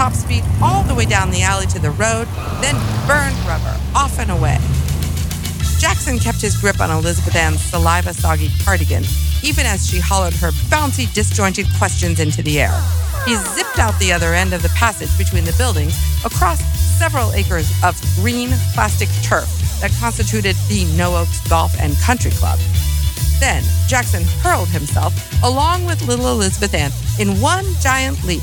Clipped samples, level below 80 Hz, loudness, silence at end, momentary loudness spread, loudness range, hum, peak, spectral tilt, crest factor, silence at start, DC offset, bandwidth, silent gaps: under 0.1%; -22 dBFS; -16 LUFS; 0 s; 3 LU; 1 LU; none; 0 dBFS; -4.5 dB/octave; 14 dB; 0 s; under 0.1%; 19.5 kHz; none